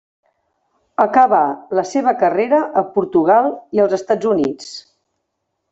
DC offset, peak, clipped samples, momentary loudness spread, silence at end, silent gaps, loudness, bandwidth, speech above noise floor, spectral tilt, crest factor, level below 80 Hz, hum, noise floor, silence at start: under 0.1%; 0 dBFS; under 0.1%; 9 LU; 0.9 s; none; -16 LUFS; 8 kHz; 58 dB; -6 dB/octave; 16 dB; -62 dBFS; none; -74 dBFS; 1 s